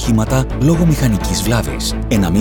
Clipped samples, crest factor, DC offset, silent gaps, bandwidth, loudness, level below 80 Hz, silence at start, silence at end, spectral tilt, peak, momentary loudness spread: under 0.1%; 12 dB; under 0.1%; none; 19 kHz; -15 LUFS; -24 dBFS; 0 s; 0 s; -5.5 dB/octave; -2 dBFS; 4 LU